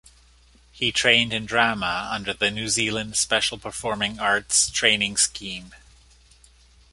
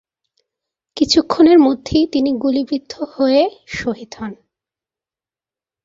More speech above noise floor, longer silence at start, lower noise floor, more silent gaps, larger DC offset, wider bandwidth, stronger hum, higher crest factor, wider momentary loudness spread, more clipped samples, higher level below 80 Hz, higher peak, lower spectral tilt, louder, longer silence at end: second, 31 dB vs over 75 dB; second, 0.75 s vs 0.95 s; second, -55 dBFS vs under -90 dBFS; neither; neither; first, 11.5 kHz vs 7.8 kHz; neither; first, 24 dB vs 16 dB; second, 11 LU vs 18 LU; neither; second, -52 dBFS vs -46 dBFS; about the same, -2 dBFS vs 0 dBFS; second, -1 dB/octave vs -4.5 dB/octave; second, -21 LUFS vs -15 LUFS; second, 1.15 s vs 1.5 s